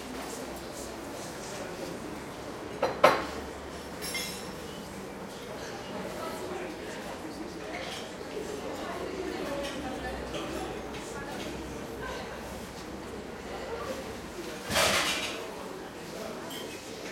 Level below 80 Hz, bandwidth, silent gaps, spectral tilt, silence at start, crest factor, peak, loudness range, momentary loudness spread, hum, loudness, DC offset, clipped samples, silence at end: -54 dBFS; 16.5 kHz; none; -3 dB/octave; 0 s; 30 dB; -6 dBFS; 7 LU; 13 LU; none; -35 LUFS; under 0.1%; under 0.1%; 0 s